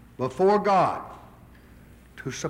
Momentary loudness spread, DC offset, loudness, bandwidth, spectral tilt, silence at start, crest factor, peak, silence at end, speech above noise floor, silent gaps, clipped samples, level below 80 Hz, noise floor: 18 LU; under 0.1%; -23 LUFS; 15 kHz; -5.5 dB/octave; 0.2 s; 16 dB; -10 dBFS; 0 s; 27 dB; none; under 0.1%; -56 dBFS; -50 dBFS